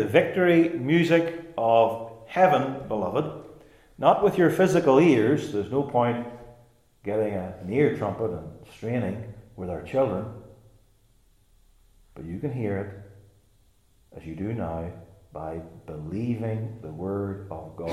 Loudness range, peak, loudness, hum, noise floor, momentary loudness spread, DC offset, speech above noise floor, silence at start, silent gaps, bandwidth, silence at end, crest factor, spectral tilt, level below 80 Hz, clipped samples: 14 LU; -4 dBFS; -25 LUFS; none; -62 dBFS; 19 LU; under 0.1%; 37 dB; 0 s; none; 14.5 kHz; 0 s; 22 dB; -7 dB/octave; -58 dBFS; under 0.1%